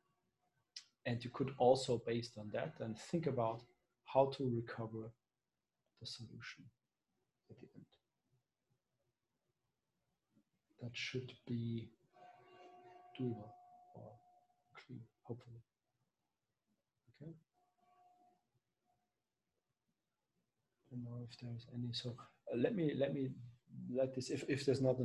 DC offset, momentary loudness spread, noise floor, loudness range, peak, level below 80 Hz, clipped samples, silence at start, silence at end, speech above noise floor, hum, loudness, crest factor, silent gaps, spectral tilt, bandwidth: under 0.1%; 24 LU; under -90 dBFS; 19 LU; -18 dBFS; -78 dBFS; under 0.1%; 0.75 s; 0 s; over 49 dB; none; -41 LUFS; 26 dB; none; -6.5 dB/octave; 11.5 kHz